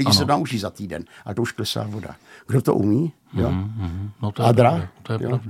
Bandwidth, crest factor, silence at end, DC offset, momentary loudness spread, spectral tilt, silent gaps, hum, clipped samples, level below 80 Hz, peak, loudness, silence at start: 15.5 kHz; 20 dB; 0 s; under 0.1%; 14 LU; -6 dB/octave; none; none; under 0.1%; -48 dBFS; -2 dBFS; -22 LUFS; 0 s